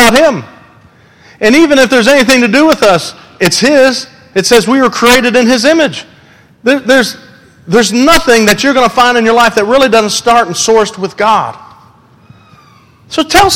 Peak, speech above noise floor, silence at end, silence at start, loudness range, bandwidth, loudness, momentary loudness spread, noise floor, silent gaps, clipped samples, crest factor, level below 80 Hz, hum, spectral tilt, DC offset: 0 dBFS; 34 dB; 0 s; 0 s; 3 LU; over 20 kHz; -8 LUFS; 10 LU; -42 dBFS; none; 0.8%; 8 dB; -36 dBFS; none; -3 dB/octave; 0.7%